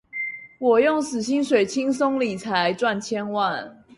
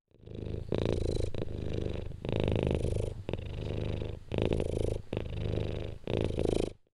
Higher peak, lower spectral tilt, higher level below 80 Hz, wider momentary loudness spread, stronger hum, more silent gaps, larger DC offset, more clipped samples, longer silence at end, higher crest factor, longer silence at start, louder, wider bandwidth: first, -6 dBFS vs -12 dBFS; second, -4.5 dB/octave vs -7.5 dB/octave; second, -64 dBFS vs -40 dBFS; about the same, 9 LU vs 7 LU; neither; neither; neither; neither; about the same, 0.25 s vs 0.15 s; about the same, 16 dB vs 20 dB; about the same, 0.15 s vs 0.25 s; first, -23 LUFS vs -35 LUFS; about the same, 11.5 kHz vs 11.5 kHz